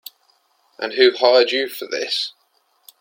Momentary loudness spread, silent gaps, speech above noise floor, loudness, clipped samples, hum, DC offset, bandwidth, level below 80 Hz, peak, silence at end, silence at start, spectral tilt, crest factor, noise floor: 13 LU; none; 46 dB; -18 LUFS; under 0.1%; none; under 0.1%; 16.5 kHz; -74 dBFS; 0 dBFS; 0.7 s; 0.8 s; -1.5 dB/octave; 20 dB; -63 dBFS